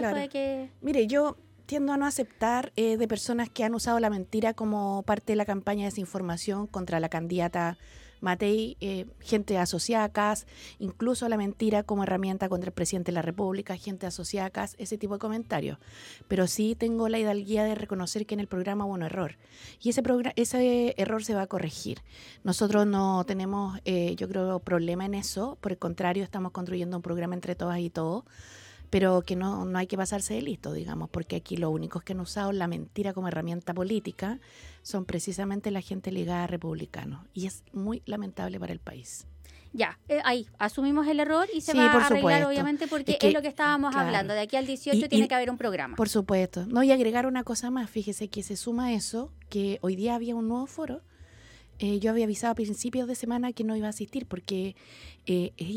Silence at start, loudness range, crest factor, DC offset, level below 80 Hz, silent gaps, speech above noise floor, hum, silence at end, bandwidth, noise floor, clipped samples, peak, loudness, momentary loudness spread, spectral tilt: 0 s; 8 LU; 22 dB; under 0.1%; -56 dBFS; none; 25 dB; none; 0 s; 17 kHz; -53 dBFS; under 0.1%; -8 dBFS; -29 LUFS; 11 LU; -5 dB/octave